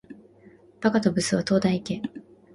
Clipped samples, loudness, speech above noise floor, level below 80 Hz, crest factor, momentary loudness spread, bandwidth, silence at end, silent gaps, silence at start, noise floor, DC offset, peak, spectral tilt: under 0.1%; -24 LUFS; 30 dB; -58 dBFS; 18 dB; 10 LU; 11.5 kHz; 0.35 s; none; 0.1 s; -53 dBFS; under 0.1%; -8 dBFS; -5.5 dB/octave